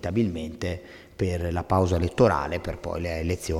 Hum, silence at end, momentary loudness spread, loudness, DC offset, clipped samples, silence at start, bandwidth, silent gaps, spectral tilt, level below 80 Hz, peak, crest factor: none; 0 s; 11 LU; -26 LUFS; under 0.1%; under 0.1%; 0.05 s; 15 kHz; none; -6.5 dB/octave; -40 dBFS; -6 dBFS; 20 dB